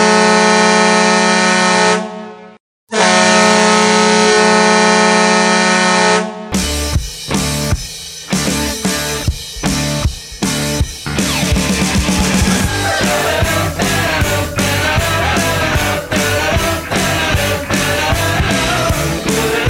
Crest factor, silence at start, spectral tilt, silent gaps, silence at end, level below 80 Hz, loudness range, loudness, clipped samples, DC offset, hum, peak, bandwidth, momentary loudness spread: 14 dB; 0 s; -3.5 dB/octave; 2.60-2.87 s; 0 s; -28 dBFS; 7 LU; -13 LUFS; under 0.1%; under 0.1%; none; 0 dBFS; 16.5 kHz; 9 LU